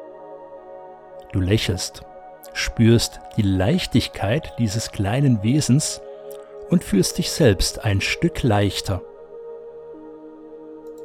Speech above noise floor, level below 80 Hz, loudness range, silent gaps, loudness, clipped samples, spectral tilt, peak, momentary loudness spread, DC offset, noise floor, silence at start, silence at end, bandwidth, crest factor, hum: 21 dB; -38 dBFS; 3 LU; none; -21 LUFS; under 0.1%; -5 dB/octave; -4 dBFS; 22 LU; under 0.1%; -40 dBFS; 0 s; 0 s; 16 kHz; 18 dB; none